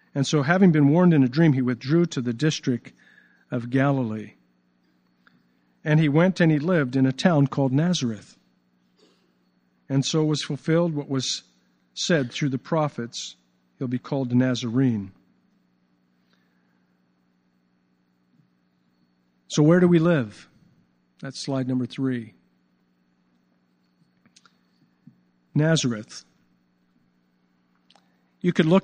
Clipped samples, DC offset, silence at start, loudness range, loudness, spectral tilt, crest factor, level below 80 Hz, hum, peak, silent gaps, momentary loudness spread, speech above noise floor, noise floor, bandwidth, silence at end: under 0.1%; under 0.1%; 0.15 s; 10 LU; -23 LUFS; -6 dB/octave; 22 dB; -68 dBFS; 60 Hz at -50 dBFS; -4 dBFS; none; 16 LU; 45 dB; -67 dBFS; 9.6 kHz; 0.05 s